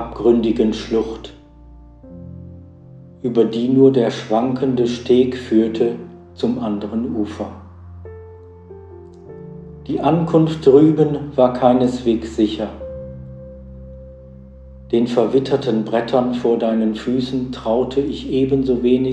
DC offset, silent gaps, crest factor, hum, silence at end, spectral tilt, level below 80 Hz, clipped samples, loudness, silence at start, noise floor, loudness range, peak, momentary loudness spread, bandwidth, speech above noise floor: under 0.1%; none; 18 dB; none; 0 s; -7.5 dB/octave; -44 dBFS; under 0.1%; -17 LUFS; 0 s; -42 dBFS; 9 LU; 0 dBFS; 23 LU; 8.8 kHz; 25 dB